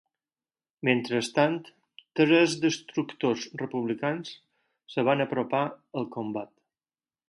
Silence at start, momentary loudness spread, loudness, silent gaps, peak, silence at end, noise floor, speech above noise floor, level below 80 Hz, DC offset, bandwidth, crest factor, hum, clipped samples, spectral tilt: 0.85 s; 14 LU; -28 LUFS; none; -6 dBFS; 0.85 s; under -90 dBFS; over 63 dB; -74 dBFS; under 0.1%; 11.5 kHz; 22 dB; none; under 0.1%; -5 dB/octave